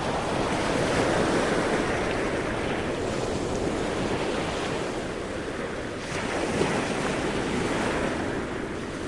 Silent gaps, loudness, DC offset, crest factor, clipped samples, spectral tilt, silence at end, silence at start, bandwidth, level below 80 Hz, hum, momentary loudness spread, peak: none; -27 LUFS; under 0.1%; 16 dB; under 0.1%; -5 dB/octave; 0 s; 0 s; 11.5 kHz; -44 dBFS; none; 8 LU; -10 dBFS